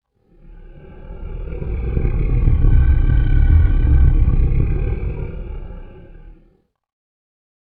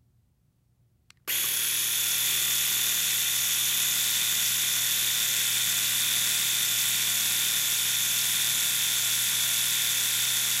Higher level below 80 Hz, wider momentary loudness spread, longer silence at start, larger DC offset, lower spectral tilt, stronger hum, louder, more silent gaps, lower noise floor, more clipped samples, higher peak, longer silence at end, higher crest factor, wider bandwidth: first, -18 dBFS vs -74 dBFS; first, 18 LU vs 1 LU; second, 0.5 s vs 1.25 s; neither; first, -12.5 dB/octave vs 2 dB/octave; neither; first, -18 LUFS vs -23 LUFS; neither; second, -57 dBFS vs -67 dBFS; neither; first, -2 dBFS vs -10 dBFS; first, 1.45 s vs 0 s; about the same, 14 dB vs 16 dB; second, 3.3 kHz vs 16 kHz